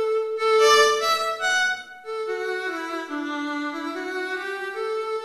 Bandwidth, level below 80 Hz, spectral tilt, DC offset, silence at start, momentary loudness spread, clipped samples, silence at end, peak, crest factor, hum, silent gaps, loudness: 14 kHz; -70 dBFS; -0.5 dB/octave; under 0.1%; 0 s; 13 LU; under 0.1%; 0 s; -6 dBFS; 18 dB; none; none; -23 LUFS